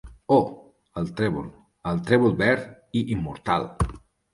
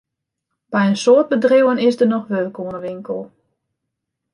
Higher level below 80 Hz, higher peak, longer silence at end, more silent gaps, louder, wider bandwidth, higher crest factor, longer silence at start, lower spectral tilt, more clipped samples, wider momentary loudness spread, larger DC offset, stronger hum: first, -42 dBFS vs -66 dBFS; about the same, -4 dBFS vs -2 dBFS; second, 0.35 s vs 1.05 s; neither; second, -25 LUFS vs -16 LUFS; about the same, 11.5 kHz vs 11 kHz; about the same, 20 dB vs 16 dB; second, 0.05 s vs 0.7 s; about the same, -7 dB/octave vs -6 dB/octave; neither; about the same, 12 LU vs 14 LU; neither; neither